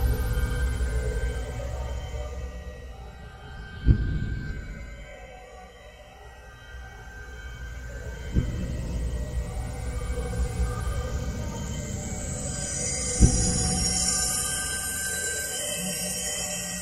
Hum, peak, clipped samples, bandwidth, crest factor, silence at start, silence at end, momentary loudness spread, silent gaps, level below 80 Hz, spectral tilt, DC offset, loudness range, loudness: none; -4 dBFS; under 0.1%; 15.5 kHz; 24 dB; 0 s; 0 s; 20 LU; none; -32 dBFS; -3.5 dB/octave; under 0.1%; 13 LU; -28 LUFS